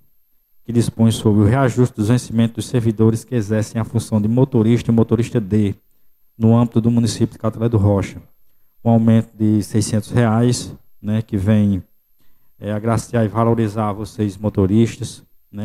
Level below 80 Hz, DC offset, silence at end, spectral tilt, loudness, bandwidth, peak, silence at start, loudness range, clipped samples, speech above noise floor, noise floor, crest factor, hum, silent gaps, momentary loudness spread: -46 dBFS; under 0.1%; 0 s; -7.5 dB/octave; -17 LUFS; 14 kHz; -2 dBFS; 0.7 s; 3 LU; under 0.1%; 39 dB; -56 dBFS; 16 dB; none; none; 8 LU